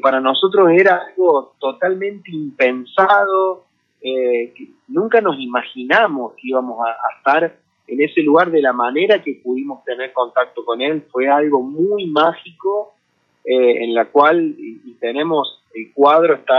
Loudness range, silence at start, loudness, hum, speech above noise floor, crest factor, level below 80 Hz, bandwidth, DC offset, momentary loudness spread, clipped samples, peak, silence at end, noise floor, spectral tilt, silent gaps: 3 LU; 0.05 s; -16 LUFS; none; 48 dB; 16 dB; -76 dBFS; 6.4 kHz; under 0.1%; 13 LU; under 0.1%; 0 dBFS; 0 s; -64 dBFS; -7 dB/octave; none